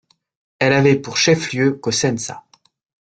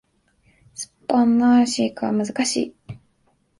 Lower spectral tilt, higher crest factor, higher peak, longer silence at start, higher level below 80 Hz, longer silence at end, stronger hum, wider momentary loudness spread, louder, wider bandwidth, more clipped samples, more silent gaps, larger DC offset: about the same, -4.5 dB/octave vs -4 dB/octave; about the same, 18 dB vs 16 dB; first, -2 dBFS vs -6 dBFS; second, 0.6 s vs 0.8 s; about the same, -56 dBFS vs -60 dBFS; about the same, 0.65 s vs 0.65 s; neither; second, 11 LU vs 25 LU; first, -17 LUFS vs -20 LUFS; second, 9.2 kHz vs 11.5 kHz; neither; neither; neither